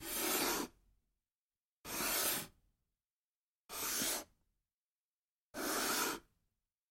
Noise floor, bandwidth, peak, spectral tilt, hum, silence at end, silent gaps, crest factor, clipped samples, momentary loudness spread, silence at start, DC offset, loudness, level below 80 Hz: under -90 dBFS; 16.5 kHz; -22 dBFS; -0.5 dB/octave; none; 0.7 s; 1.35-1.50 s, 1.60-1.84 s, 3.10-3.67 s, 4.74-5.54 s; 20 dB; under 0.1%; 14 LU; 0 s; under 0.1%; -37 LUFS; -68 dBFS